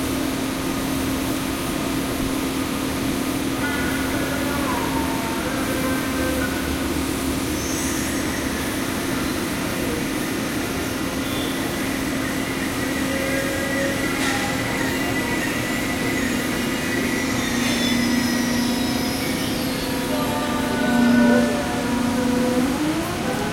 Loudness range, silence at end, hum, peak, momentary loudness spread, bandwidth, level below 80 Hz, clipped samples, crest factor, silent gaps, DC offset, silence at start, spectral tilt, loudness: 4 LU; 0 s; none; -6 dBFS; 4 LU; 16.5 kHz; -40 dBFS; under 0.1%; 16 dB; none; under 0.1%; 0 s; -4 dB/octave; -22 LUFS